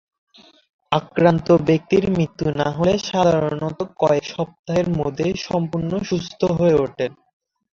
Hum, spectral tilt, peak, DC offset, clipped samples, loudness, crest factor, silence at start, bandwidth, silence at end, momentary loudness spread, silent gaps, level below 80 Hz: none; -7 dB/octave; -2 dBFS; under 0.1%; under 0.1%; -20 LUFS; 18 dB; 0.9 s; 7.4 kHz; 0.6 s; 8 LU; 4.59-4.64 s; -48 dBFS